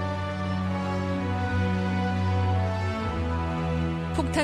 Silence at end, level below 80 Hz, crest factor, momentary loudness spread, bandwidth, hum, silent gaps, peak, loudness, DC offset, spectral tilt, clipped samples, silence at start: 0 s; -40 dBFS; 18 dB; 3 LU; 10.5 kHz; none; none; -8 dBFS; -28 LUFS; under 0.1%; -7 dB/octave; under 0.1%; 0 s